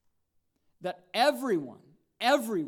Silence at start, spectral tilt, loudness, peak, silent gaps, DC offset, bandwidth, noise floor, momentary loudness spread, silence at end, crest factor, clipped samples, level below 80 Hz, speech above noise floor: 0.8 s; -4 dB/octave; -29 LUFS; -12 dBFS; none; under 0.1%; 18.5 kHz; -74 dBFS; 13 LU; 0 s; 20 dB; under 0.1%; -84 dBFS; 46 dB